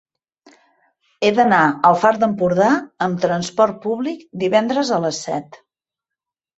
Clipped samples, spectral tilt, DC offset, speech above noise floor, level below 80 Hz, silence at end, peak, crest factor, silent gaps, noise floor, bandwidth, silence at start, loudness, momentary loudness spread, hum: under 0.1%; -5 dB/octave; under 0.1%; 69 dB; -62 dBFS; 1.05 s; 0 dBFS; 18 dB; none; -86 dBFS; 8.2 kHz; 1.2 s; -18 LUFS; 10 LU; none